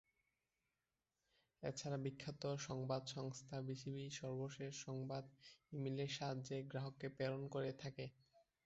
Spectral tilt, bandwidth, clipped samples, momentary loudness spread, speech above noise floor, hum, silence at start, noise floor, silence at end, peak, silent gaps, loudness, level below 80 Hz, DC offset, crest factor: -5.5 dB/octave; 8 kHz; under 0.1%; 7 LU; over 43 dB; none; 1.6 s; under -90 dBFS; 0.25 s; -30 dBFS; none; -48 LUFS; -78 dBFS; under 0.1%; 20 dB